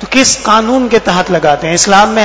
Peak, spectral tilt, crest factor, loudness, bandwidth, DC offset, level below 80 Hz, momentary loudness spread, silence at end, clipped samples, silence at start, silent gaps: 0 dBFS; -3 dB/octave; 10 dB; -9 LUFS; 8 kHz; 0.9%; -36 dBFS; 4 LU; 0 s; 2%; 0 s; none